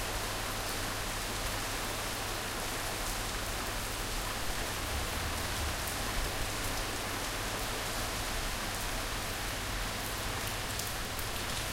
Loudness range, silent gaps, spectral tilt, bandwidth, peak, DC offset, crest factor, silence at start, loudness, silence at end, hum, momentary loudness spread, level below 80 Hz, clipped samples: 1 LU; none; -2.5 dB/octave; 17 kHz; -16 dBFS; under 0.1%; 20 dB; 0 s; -35 LUFS; 0 s; none; 1 LU; -42 dBFS; under 0.1%